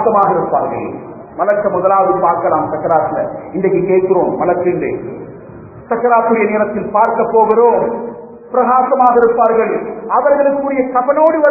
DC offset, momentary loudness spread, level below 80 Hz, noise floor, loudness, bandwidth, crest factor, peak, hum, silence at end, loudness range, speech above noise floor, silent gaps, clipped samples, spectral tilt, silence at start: under 0.1%; 13 LU; -50 dBFS; -33 dBFS; -13 LUFS; 2.7 kHz; 14 dB; 0 dBFS; none; 0 s; 3 LU; 21 dB; none; under 0.1%; -11 dB/octave; 0 s